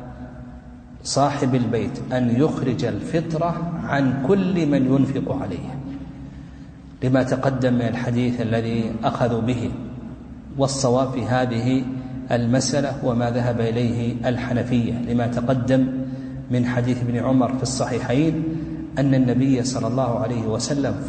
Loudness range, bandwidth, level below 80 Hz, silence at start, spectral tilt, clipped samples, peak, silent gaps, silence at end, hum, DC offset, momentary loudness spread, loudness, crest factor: 2 LU; 9.2 kHz; -44 dBFS; 0 s; -6.5 dB/octave; under 0.1%; -6 dBFS; none; 0 s; none; under 0.1%; 14 LU; -22 LUFS; 16 dB